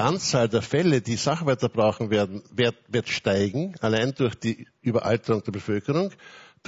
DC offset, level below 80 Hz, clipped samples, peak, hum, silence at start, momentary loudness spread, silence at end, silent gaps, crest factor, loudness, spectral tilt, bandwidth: under 0.1%; -54 dBFS; under 0.1%; -6 dBFS; none; 0 s; 6 LU; 0.25 s; none; 18 dB; -25 LUFS; -5.5 dB/octave; 8 kHz